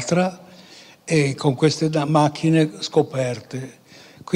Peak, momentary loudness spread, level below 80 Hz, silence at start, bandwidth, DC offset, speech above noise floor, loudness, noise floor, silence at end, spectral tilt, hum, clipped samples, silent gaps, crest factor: -4 dBFS; 15 LU; -62 dBFS; 0 s; 11.5 kHz; under 0.1%; 26 dB; -20 LUFS; -46 dBFS; 0 s; -6 dB/octave; none; under 0.1%; none; 16 dB